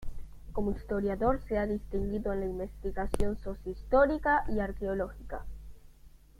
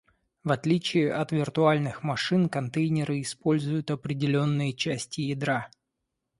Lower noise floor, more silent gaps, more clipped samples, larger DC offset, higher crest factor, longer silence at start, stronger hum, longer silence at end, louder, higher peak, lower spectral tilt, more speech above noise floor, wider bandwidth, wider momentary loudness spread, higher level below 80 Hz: second, -55 dBFS vs -82 dBFS; neither; neither; neither; about the same, 22 dB vs 18 dB; second, 0 s vs 0.45 s; neither; second, 0.3 s vs 0.7 s; second, -32 LUFS vs -27 LUFS; about the same, -10 dBFS vs -8 dBFS; first, -7.5 dB/octave vs -6 dB/octave; second, 24 dB vs 56 dB; first, 13.5 kHz vs 11.5 kHz; first, 17 LU vs 7 LU; first, -40 dBFS vs -64 dBFS